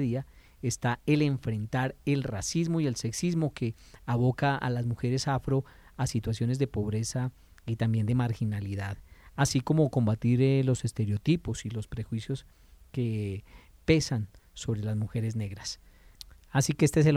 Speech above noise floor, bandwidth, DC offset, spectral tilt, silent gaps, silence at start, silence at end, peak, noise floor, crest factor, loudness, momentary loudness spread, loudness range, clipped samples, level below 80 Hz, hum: 23 dB; 14.5 kHz; under 0.1%; -6 dB/octave; none; 0 s; 0 s; -10 dBFS; -51 dBFS; 20 dB; -30 LUFS; 13 LU; 4 LU; under 0.1%; -52 dBFS; none